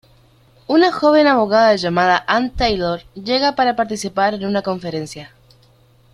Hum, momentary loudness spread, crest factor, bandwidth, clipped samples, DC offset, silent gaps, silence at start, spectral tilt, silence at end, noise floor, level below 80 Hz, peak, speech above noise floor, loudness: none; 12 LU; 16 dB; 12.5 kHz; under 0.1%; under 0.1%; none; 0.7 s; -5 dB/octave; 0.9 s; -52 dBFS; -42 dBFS; -2 dBFS; 36 dB; -16 LUFS